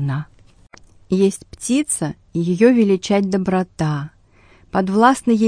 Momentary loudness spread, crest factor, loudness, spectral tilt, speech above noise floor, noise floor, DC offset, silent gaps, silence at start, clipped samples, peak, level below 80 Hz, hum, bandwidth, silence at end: 12 LU; 18 dB; -18 LUFS; -6 dB/octave; 34 dB; -51 dBFS; under 0.1%; none; 0 s; under 0.1%; 0 dBFS; -50 dBFS; none; 10.5 kHz; 0 s